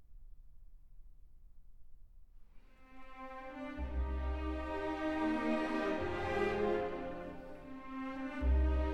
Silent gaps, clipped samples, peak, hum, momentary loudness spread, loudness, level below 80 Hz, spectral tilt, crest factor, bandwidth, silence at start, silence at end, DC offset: none; under 0.1%; -22 dBFS; none; 16 LU; -38 LUFS; -42 dBFS; -7.5 dB/octave; 16 dB; 7.8 kHz; 0 s; 0 s; under 0.1%